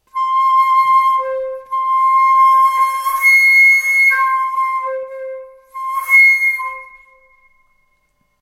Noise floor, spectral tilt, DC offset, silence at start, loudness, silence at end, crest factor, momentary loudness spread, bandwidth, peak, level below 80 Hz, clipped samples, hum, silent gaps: -62 dBFS; 2.5 dB/octave; under 0.1%; 0.15 s; -11 LUFS; 1.55 s; 12 dB; 18 LU; 16 kHz; -2 dBFS; -62 dBFS; under 0.1%; none; none